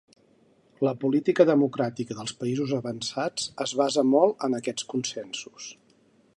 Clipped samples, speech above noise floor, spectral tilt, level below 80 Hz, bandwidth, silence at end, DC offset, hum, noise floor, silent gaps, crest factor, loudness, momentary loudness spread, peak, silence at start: under 0.1%; 36 dB; -5 dB/octave; -72 dBFS; 11.5 kHz; 0.65 s; under 0.1%; none; -62 dBFS; none; 22 dB; -26 LUFS; 14 LU; -4 dBFS; 0.8 s